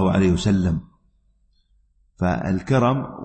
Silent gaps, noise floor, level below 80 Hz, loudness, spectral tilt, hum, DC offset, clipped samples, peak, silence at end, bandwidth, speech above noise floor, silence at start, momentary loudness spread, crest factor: none; -62 dBFS; -42 dBFS; -21 LUFS; -7.5 dB/octave; none; under 0.1%; under 0.1%; -4 dBFS; 0 s; 8.6 kHz; 42 dB; 0 s; 6 LU; 16 dB